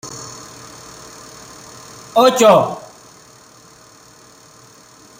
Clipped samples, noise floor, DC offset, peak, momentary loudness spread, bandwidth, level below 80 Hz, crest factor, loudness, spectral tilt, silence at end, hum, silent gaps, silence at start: under 0.1%; -45 dBFS; under 0.1%; 0 dBFS; 26 LU; 16 kHz; -60 dBFS; 20 dB; -13 LUFS; -4 dB/octave; 2.4 s; none; none; 0.05 s